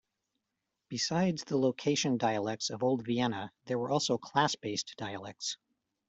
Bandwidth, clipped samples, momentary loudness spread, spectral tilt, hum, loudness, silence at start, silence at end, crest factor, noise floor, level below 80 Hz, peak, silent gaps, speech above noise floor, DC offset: 8.2 kHz; under 0.1%; 10 LU; -4.5 dB/octave; none; -32 LUFS; 0.9 s; 0.55 s; 20 dB; -86 dBFS; -72 dBFS; -12 dBFS; none; 54 dB; under 0.1%